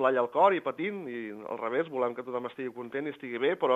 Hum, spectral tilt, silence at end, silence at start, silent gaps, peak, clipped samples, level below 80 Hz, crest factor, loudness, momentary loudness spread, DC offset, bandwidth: none; -7 dB/octave; 0 s; 0 s; none; -10 dBFS; under 0.1%; -82 dBFS; 20 dB; -31 LUFS; 13 LU; under 0.1%; 7.8 kHz